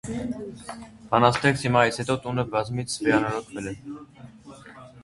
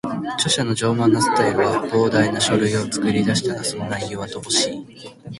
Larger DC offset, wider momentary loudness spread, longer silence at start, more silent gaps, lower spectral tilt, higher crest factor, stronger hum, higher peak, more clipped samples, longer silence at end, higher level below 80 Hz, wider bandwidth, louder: neither; first, 21 LU vs 9 LU; about the same, 0.05 s vs 0.05 s; neither; first, -5.5 dB/octave vs -4 dB/octave; first, 24 dB vs 16 dB; neither; about the same, -2 dBFS vs -4 dBFS; neither; about the same, 0 s vs 0 s; about the same, -54 dBFS vs -52 dBFS; about the same, 11.5 kHz vs 12 kHz; second, -24 LUFS vs -19 LUFS